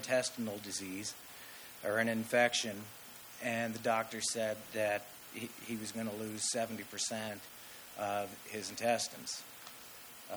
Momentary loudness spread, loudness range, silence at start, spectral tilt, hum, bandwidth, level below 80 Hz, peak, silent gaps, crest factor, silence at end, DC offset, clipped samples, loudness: 15 LU; 4 LU; 0 s; -2.5 dB/octave; none; over 20 kHz; -78 dBFS; -16 dBFS; none; 22 dB; 0 s; under 0.1%; under 0.1%; -37 LUFS